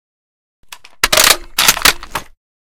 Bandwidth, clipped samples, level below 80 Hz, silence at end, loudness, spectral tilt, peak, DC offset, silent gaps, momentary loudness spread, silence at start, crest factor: over 20 kHz; 0.5%; -36 dBFS; 0.45 s; -10 LUFS; 0.5 dB/octave; 0 dBFS; under 0.1%; none; 16 LU; 1.05 s; 16 dB